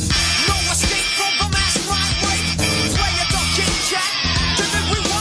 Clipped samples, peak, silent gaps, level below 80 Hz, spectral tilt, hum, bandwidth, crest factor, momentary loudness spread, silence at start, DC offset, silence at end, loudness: under 0.1%; -4 dBFS; none; -28 dBFS; -2.5 dB/octave; none; 11 kHz; 14 dB; 2 LU; 0 s; under 0.1%; 0 s; -17 LUFS